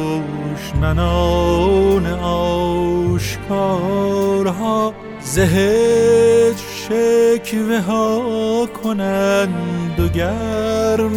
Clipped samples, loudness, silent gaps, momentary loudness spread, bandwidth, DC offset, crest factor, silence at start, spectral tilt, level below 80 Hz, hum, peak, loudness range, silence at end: under 0.1%; -17 LUFS; none; 8 LU; 18 kHz; under 0.1%; 14 dB; 0 s; -6 dB/octave; -30 dBFS; none; -2 dBFS; 3 LU; 0 s